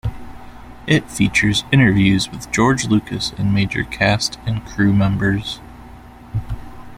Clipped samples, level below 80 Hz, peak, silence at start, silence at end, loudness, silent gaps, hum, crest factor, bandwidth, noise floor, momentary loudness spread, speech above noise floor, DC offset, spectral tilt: under 0.1%; -38 dBFS; -2 dBFS; 0.05 s; 0 s; -17 LUFS; none; 60 Hz at -40 dBFS; 16 dB; 15.5 kHz; -39 dBFS; 15 LU; 22 dB; under 0.1%; -5 dB/octave